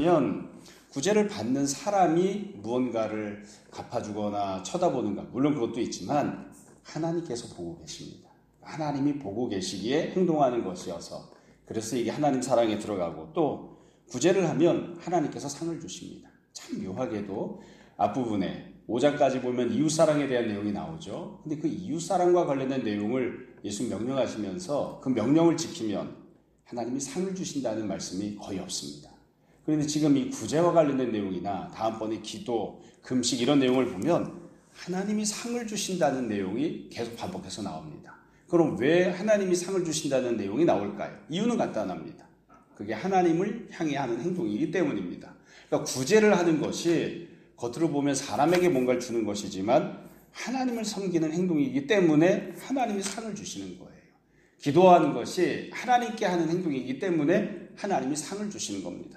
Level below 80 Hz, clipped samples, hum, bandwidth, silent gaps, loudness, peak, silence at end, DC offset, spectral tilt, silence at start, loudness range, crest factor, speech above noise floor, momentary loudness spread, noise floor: -66 dBFS; under 0.1%; none; 14.5 kHz; none; -28 LUFS; -6 dBFS; 0 s; under 0.1%; -5 dB/octave; 0 s; 5 LU; 22 dB; 35 dB; 15 LU; -63 dBFS